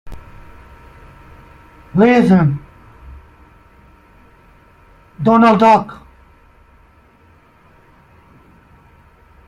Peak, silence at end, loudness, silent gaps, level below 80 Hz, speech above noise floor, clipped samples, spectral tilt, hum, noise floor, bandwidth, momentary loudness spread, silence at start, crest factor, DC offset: 0 dBFS; 3.55 s; -12 LUFS; none; -46 dBFS; 39 dB; under 0.1%; -8 dB/octave; none; -49 dBFS; 9.8 kHz; 13 LU; 0.05 s; 18 dB; under 0.1%